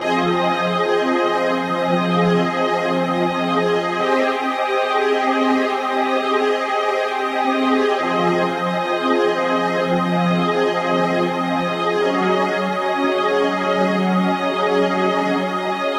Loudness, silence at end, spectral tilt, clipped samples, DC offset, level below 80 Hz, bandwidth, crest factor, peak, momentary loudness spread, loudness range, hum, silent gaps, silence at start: -18 LUFS; 0 s; -6 dB/octave; under 0.1%; under 0.1%; -62 dBFS; 14.5 kHz; 14 dB; -4 dBFS; 2 LU; 0 LU; none; none; 0 s